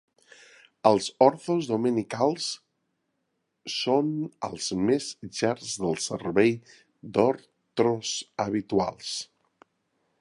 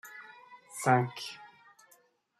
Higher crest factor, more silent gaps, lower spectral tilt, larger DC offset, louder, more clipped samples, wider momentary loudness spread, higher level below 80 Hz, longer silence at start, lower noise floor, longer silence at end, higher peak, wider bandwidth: about the same, 24 dB vs 24 dB; neither; about the same, -4.5 dB/octave vs -5 dB/octave; neither; first, -27 LUFS vs -30 LUFS; neither; second, 11 LU vs 23 LU; first, -64 dBFS vs -78 dBFS; first, 0.85 s vs 0.05 s; first, -78 dBFS vs -66 dBFS; about the same, 0.95 s vs 0.95 s; first, -4 dBFS vs -12 dBFS; second, 11.5 kHz vs 13.5 kHz